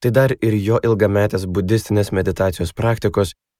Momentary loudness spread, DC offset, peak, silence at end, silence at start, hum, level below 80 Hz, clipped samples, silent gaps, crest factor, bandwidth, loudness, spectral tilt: 5 LU; under 0.1%; -2 dBFS; 0.25 s; 0 s; none; -42 dBFS; under 0.1%; none; 16 dB; 15.5 kHz; -18 LUFS; -7 dB/octave